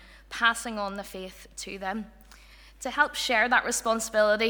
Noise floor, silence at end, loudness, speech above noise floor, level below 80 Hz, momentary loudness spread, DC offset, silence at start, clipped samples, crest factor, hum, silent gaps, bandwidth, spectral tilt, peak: -51 dBFS; 0 s; -26 LUFS; 24 dB; -54 dBFS; 17 LU; under 0.1%; 0 s; under 0.1%; 20 dB; none; none; over 20 kHz; -1.5 dB/octave; -8 dBFS